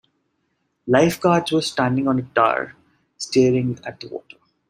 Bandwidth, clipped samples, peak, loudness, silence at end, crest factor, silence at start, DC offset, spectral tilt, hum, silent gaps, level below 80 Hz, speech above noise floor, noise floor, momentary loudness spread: 15.5 kHz; under 0.1%; 0 dBFS; -19 LUFS; 0.5 s; 20 dB; 0.85 s; under 0.1%; -5.5 dB/octave; none; none; -60 dBFS; 52 dB; -71 dBFS; 17 LU